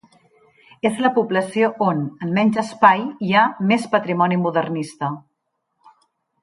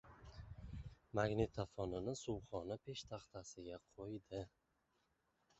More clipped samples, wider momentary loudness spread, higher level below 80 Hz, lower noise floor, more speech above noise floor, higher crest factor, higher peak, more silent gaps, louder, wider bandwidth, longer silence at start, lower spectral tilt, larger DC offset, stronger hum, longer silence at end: neither; second, 10 LU vs 15 LU; second, -68 dBFS vs -62 dBFS; second, -74 dBFS vs -83 dBFS; first, 56 dB vs 38 dB; second, 18 dB vs 24 dB; first, -2 dBFS vs -22 dBFS; neither; first, -19 LUFS vs -47 LUFS; first, 11.5 kHz vs 8 kHz; first, 0.85 s vs 0.05 s; about the same, -6.5 dB/octave vs -6 dB/octave; neither; neither; first, 1.25 s vs 1.1 s